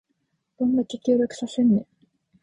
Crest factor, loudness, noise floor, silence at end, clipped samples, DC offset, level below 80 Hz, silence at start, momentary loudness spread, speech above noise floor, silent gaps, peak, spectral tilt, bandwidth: 16 dB; -23 LUFS; -74 dBFS; 0.6 s; under 0.1%; under 0.1%; -62 dBFS; 0.6 s; 5 LU; 52 dB; none; -10 dBFS; -7 dB/octave; 9.8 kHz